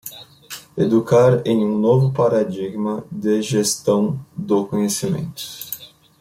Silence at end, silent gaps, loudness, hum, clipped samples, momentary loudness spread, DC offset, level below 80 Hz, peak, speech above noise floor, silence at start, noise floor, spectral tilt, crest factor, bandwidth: 0.35 s; none; -19 LUFS; none; under 0.1%; 15 LU; under 0.1%; -56 dBFS; -4 dBFS; 21 dB; 0.05 s; -39 dBFS; -6 dB/octave; 16 dB; 16.5 kHz